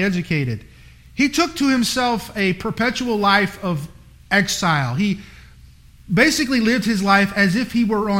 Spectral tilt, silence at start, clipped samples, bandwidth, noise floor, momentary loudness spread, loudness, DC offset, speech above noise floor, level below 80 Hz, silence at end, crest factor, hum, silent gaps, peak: -4.5 dB/octave; 0 s; under 0.1%; 16.5 kHz; -45 dBFS; 10 LU; -18 LUFS; under 0.1%; 27 dB; -46 dBFS; 0 s; 18 dB; none; none; -2 dBFS